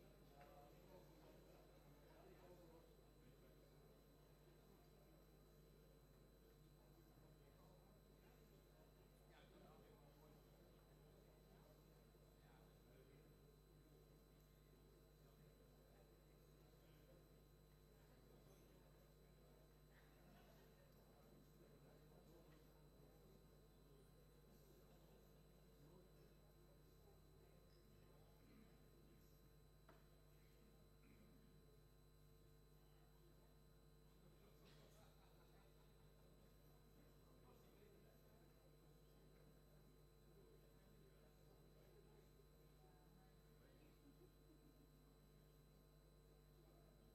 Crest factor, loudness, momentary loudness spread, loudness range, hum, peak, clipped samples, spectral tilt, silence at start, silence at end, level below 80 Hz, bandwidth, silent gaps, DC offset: 18 dB; -69 LUFS; 3 LU; 1 LU; none; -52 dBFS; under 0.1%; -5.5 dB/octave; 0 s; 0 s; -74 dBFS; 12.5 kHz; none; under 0.1%